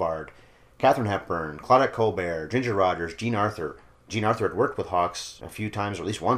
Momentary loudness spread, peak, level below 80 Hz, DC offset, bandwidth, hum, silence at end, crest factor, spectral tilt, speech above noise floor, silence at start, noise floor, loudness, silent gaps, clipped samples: 13 LU; -6 dBFS; -56 dBFS; under 0.1%; 15.5 kHz; none; 0 s; 20 dB; -5.5 dB/octave; 28 dB; 0 s; -53 dBFS; -26 LUFS; none; under 0.1%